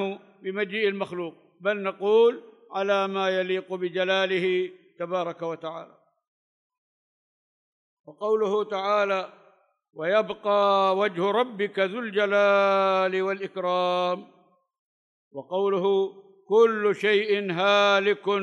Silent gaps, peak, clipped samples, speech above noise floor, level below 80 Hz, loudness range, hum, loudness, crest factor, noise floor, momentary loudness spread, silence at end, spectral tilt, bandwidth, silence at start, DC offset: 6.27-6.70 s, 6.78-8.04 s, 14.79-15.31 s; -8 dBFS; under 0.1%; 36 dB; -82 dBFS; 9 LU; none; -24 LUFS; 18 dB; -61 dBFS; 13 LU; 0 s; -5 dB/octave; 9.8 kHz; 0 s; under 0.1%